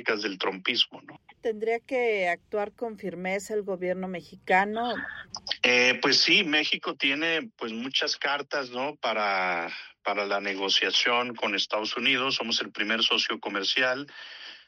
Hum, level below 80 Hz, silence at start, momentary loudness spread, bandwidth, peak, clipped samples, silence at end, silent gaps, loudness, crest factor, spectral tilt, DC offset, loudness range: none; -72 dBFS; 0 s; 13 LU; 12.5 kHz; -8 dBFS; under 0.1%; 0.1 s; none; -26 LUFS; 20 dB; -2.5 dB/octave; under 0.1%; 6 LU